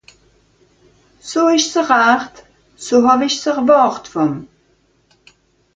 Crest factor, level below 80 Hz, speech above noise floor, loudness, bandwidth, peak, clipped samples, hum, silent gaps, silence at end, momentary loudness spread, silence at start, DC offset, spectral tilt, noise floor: 16 dB; -58 dBFS; 44 dB; -14 LUFS; 9.4 kHz; 0 dBFS; under 0.1%; none; none; 1.3 s; 16 LU; 1.25 s; under 0.1%; -3.5 dB/octave; -58 dBFS